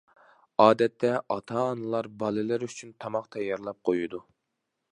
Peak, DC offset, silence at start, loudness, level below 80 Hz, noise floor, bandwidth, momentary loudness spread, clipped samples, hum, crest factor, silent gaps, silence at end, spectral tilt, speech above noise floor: -4 dBFS; under 0.1%; 0.6 s; -28 LUFS; -72 dBFS; -82 dBFS; 11 kHz; 13 LU; under 0.1%; none; 24 dB; none; 0.7 s; -6 dB/octave; 54 dB